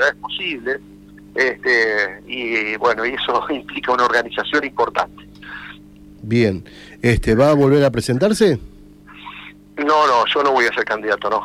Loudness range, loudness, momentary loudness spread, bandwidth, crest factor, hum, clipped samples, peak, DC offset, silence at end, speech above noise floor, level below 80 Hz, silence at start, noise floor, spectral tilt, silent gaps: 4 LU; -18 LUFS; 19 LU; 15 kHz; 14 dB; 50 Hz at -45 dBFS; under 0.1%; -4 dBFS; under 0.1%; 0 s; 24 dB; -40 dBFS; 0 s; -42 dBFS; -5.5 dB/octave; none